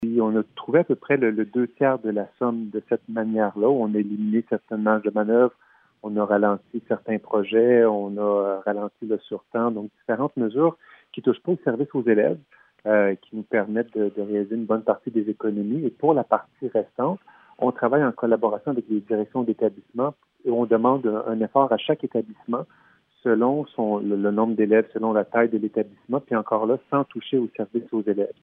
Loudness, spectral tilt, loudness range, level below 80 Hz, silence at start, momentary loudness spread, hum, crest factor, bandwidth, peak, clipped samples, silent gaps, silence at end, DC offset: -23 LUFS; -10.5 dB/octave; 2 LU; -76 dBFS; 0 s; 8 LU; none; 20 dB; 3.8 kHz; -2 dBFS; under 0.1%; none; 0.1 s; under 0.1%